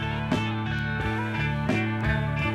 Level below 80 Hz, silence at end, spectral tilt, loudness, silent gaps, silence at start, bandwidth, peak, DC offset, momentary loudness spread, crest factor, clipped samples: -38 dBFS; 0 s; -7 dB/octave; -27 LUFS; none; 0 s; 11 kHz; -12 dBFS; under 0.1%; 2 LU; 16 dB; under 0.1%